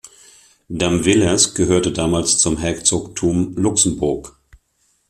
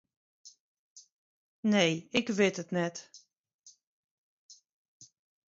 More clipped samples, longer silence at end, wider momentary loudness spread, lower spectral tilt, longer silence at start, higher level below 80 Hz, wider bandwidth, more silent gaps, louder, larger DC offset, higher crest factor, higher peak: neither; first, 0.8 s vs 0.45 s; about the same, 7 LU vs 9 LU; about the same, -3.5 dB/octave vs -4.5 dB/octave; second, 0.05 s vs 0.45 s; first, -42 dBFS vs -76 dBFS; first, 14 kHz vs 7.8 kHz; second, none vs 0.60-0.96 s, 1.12-1.63 s, 3.38-3.44 s, 3.54-3.59 s, 3.83-4.49 s, 4.72-5.00 s; first, -16 LUFS vs -30 LUFS; neither; second, 18 dB vs 24 dB; first, 0 dBFS vs -12 dBFS